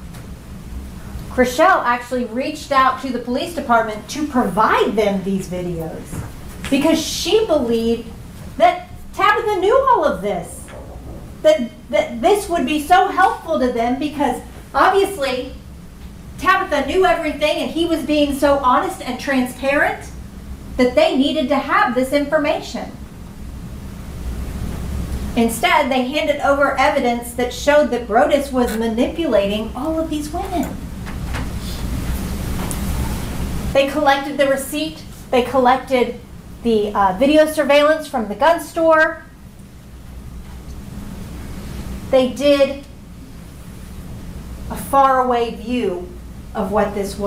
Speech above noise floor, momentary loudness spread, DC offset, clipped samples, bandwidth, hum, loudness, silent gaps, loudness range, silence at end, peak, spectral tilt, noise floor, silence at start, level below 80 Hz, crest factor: 22 dB; 20 LU; under 0.1%; under 0.1%; 16 kHz; none; -18 LUFS; none; 5 LU; 0 s; -2 dBFS; -5 dB/octave; -39 dBFS; 0 s; -34 dBFS; 16 dB